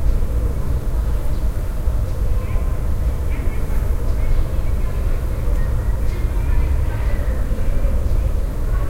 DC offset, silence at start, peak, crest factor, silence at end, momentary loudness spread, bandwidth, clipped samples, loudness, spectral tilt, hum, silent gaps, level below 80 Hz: under 0.1%; 0 s; -4 dBFS; 12 dB; 0 s; 3 LU; 15.5 kHz; under 0.1%; -23 LUFS; -7.5 dB/octave; none; none; -18 dBFS